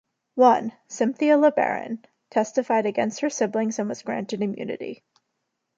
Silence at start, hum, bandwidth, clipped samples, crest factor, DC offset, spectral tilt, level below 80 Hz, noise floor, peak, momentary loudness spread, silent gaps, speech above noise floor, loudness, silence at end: 0.35 s; none; 9 kHz; under 0.1%; 20 dB; under 0.1%; -5 dB/octave; -76 dBFS; -78 dBFS; -4 dBFS; 16 LU; none; 56 dB; -23 LUFS; 0.85 s